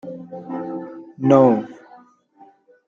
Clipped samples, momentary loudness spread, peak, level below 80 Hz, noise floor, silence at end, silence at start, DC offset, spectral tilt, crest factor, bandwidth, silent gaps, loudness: under 0.1%; 22 LU; -2 dBFS; -64 dBFS; -52 dBFS; 1.15 s; 0.05 s; under 0.1%; -9 dB/octave; 20 dB; 7.2 kHz; none; -18 LUFS